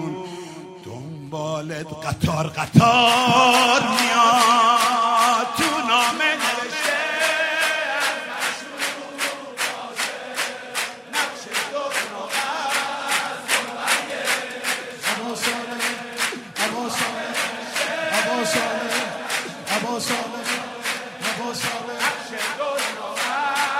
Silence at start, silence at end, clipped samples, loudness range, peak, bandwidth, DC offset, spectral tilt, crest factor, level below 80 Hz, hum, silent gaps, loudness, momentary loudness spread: 0 s; 0 s; under 0.1%; 9 LU; 0 dBFS; 16 kHz; under 0.1%; -3 dB/octave; 22 dB; -60 dBFS; none; none; -21 LUFS; 11 LU